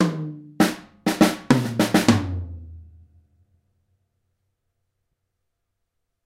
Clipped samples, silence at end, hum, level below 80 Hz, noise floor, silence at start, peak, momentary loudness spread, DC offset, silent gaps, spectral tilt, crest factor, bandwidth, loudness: under 0.1%; 3.45 s; none; -50 dBFS; -77 dBFS; 0 s; 0 dBFS; 16 LU; under 0.1%; none; -5.5 dB/octave; 24 dB; 16 kHz; -21 LUFS